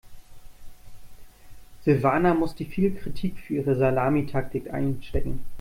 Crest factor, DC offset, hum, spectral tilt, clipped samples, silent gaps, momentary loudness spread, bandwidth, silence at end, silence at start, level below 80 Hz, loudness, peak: 18 dB; under 0.1%; none; -8.5 dB/octave; under 0.1%; none; 10 LU; 16 kHz; 0 s; 0.05 s; -40 dBFS; -26 LUFS; -8 dBFS